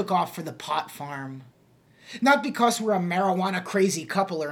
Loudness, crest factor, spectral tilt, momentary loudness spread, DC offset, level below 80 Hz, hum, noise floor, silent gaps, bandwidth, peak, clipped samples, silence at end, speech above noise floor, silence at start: -25 LUFS; 18 dB; -4.5 dB/octave; 14 LU; under 0.1%; -76 dBFS; none; -58 dBFS; none; 18 kHz; -8 dBFS; under 0.1%; 0 s; 33 dB; 0 s